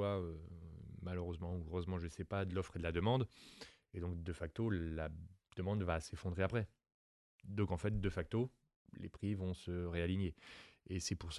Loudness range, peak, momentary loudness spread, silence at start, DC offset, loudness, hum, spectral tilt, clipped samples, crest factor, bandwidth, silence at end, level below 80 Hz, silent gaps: 1 LU; -22 dBFS; 15 LU; 0 s; under 0.1%; -42 LUFS; none; -6.5 dB/octave; under 0.1%; 20 dB; 12 kHz; 0 s; -52 dBFS; 6.94-7.39 s, 8.76-8.85 s